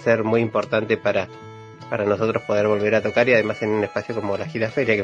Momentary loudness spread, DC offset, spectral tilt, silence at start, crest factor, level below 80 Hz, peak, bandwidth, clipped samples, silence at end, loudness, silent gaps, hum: 10 LU; under 0.1%; -6.5 dB/octave; 0 s; 20 dB; -60 dBFS; -2 dBFS; 7.8 kHz; under 0.1%; 0 s; -21 LUFS; none; none